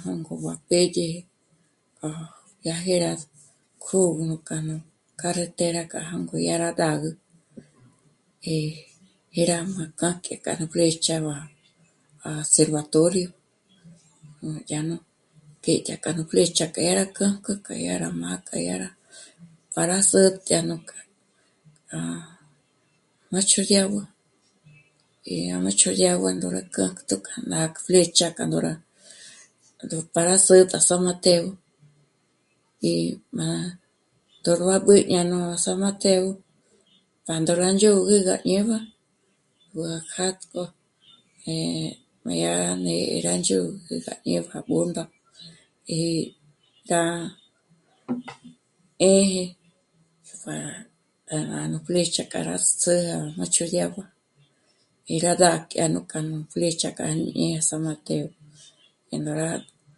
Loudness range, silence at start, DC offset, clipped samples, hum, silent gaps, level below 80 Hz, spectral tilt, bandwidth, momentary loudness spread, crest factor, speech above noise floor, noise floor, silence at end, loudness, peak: 8 LU; 0 s; under 0.1%; under 0.1%; none; none; -64 dBFS; -4 dB/octave; 11.5 kHz; 17 LU; 24 dB; 45 dB; -68 dBFS; 0.35 s; -23 LUFS; 0 dBFS